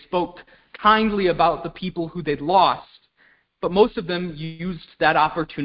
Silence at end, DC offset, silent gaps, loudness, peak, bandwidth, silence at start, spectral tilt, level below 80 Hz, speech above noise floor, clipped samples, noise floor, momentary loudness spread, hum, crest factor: 0 s; under 0.1%; none; -21 LUFS; -2 dBFS; 5.6 kHz; 0.1 s; -10 dB/octave; -50 dBFS; 39 dB; under 0.1%; -60 dBFS; 13 LU; none; 20 dB